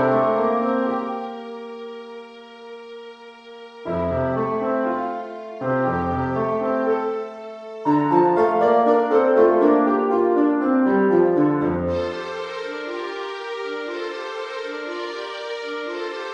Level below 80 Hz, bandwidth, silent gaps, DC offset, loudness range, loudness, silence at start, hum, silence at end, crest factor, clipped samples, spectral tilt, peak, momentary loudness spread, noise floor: -54 dBFS; 8.2 kHz; none; under 0.1%; 11 LU; -21 LUFS; 0 s; none; 0 s; 18 dB; under 0.1%; -7.5 dB/octave; -4 dBFS; 19 LU; -41 dBFS